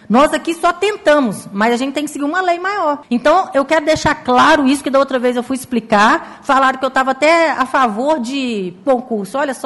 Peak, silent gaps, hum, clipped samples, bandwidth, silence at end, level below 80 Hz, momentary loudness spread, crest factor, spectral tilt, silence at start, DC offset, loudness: -4 dBFS; none; none; under 0.1%; 12 kHz; 0 s; -46 dBFS; 8 LU; 12 dB; -4 dB/octave; 0.1 s; under 0.1%; -15 LUFS